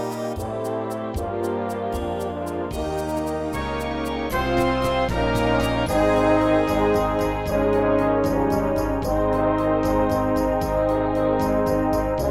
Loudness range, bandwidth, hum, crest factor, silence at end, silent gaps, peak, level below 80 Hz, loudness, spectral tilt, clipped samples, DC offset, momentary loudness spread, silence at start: 6 LU; 16.5 kHz; none; 14 dB; 0 s; none; -8 dBFS; -34 dBFS; -22 LUFS; -6.5 dB/octave; under 0.1%; under 0.1%; 8 LU; 0 s